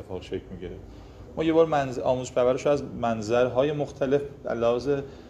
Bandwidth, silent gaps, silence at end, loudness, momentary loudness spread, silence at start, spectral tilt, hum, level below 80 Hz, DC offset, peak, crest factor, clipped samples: 9 kHz; none; 0 s; -26 LUFS; 17 LU; 0 s; -6.5 dB/octave; none; -50 dBFS; under 0.1%; -8 dBFS; 18 dB; under 0.1%